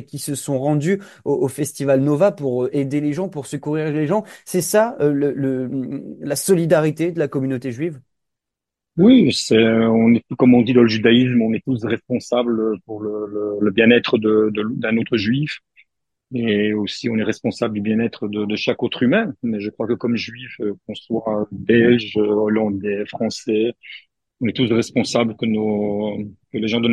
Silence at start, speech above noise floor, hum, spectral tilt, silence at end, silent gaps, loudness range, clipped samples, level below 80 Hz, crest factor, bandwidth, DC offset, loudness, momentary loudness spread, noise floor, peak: 0 s; 66 dB; none; -5.5 dB/octave; 0 s; none; 6 LU; under 0.1%; -60 dBFS; 18 dB; 12.5 kHz; under 0.1%; -19 LUFS; 12 LU; -85 dBFS; 0 dBFS